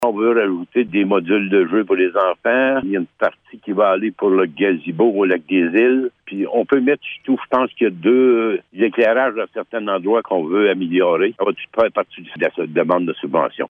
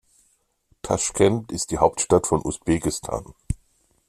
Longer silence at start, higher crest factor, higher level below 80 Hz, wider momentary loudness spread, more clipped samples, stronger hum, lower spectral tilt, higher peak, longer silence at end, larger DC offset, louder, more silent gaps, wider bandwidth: second, 0 s vs 0.85 s; second, 14 dB vs 22 dB; second, -64 dBFS vs -42 dBFS; second, 7 LU vs 14 LU; neither; neither; first, -7.5 dB/octave vs -5 dB/octave; about the same, -2 dBFS vs -4 dBFS; second, 0.05 s vs 0.55 s; neither; first, -17 LUFS vs -23 LUFS; neither; second, 3.8 kHz vs 14 kHz